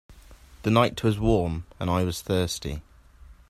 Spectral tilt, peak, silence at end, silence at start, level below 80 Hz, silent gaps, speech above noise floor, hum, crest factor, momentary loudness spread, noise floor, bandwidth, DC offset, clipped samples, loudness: -6 dB/octave; -6 dBFS; 0.15 s; 0.1 s; -42 dBFS; none; 26 dB; none; 22 dB; 10 LU; -50 dBFS; 15.5 kHz; under 0.1%; under 0.1%; -26 LUFS